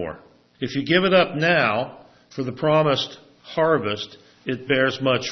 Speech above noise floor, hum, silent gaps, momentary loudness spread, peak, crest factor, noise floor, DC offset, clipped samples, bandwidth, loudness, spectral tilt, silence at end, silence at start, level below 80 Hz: 22 dB; none; none; 15 LU; -4 dBFS; 18 dB; -43 dBFS; under 0.1%; under 0.1%; 6.4 kHz; -21 LUFS; -5.5 dB/octave; 0 s; 0 s; -60 dBFS